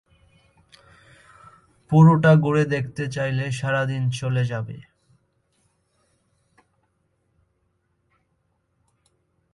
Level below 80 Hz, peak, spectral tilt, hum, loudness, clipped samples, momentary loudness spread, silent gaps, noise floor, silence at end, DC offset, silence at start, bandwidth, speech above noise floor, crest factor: -58 dBFS; -4 dBFS; -7.5 dB/octave; none; -20 LUFS; under 0.1%; 14 LU; none; -70 dBFS; 4.7 s; under 0.1%; 1.9 s; 11 kHz; 51 dB; 20 dB